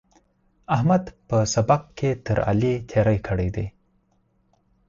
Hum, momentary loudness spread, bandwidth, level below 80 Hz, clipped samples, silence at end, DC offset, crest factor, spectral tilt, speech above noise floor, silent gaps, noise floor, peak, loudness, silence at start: none; 6 LU; 7.6 kHz; -42 dBFS; under 0.1%; 1.2 s; under 0.1%; 18 dB; -6.5 dB/octave; 44 dB; none; -65 dBFS; -6 dBFS; -23 LUFS; 0.7 s